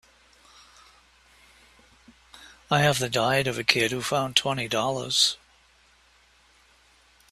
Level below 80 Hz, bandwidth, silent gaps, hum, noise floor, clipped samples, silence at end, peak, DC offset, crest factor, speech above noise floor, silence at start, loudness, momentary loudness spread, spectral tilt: -60 dBFS; 15 kHz; none; none; -60 dBFS; under 0.1%; 1.95 s; 0 dBFS; under 0.1%; 28 dB; 35 dB; 2.35 s; -23 LUFS; 5 LU; -3 dB/octave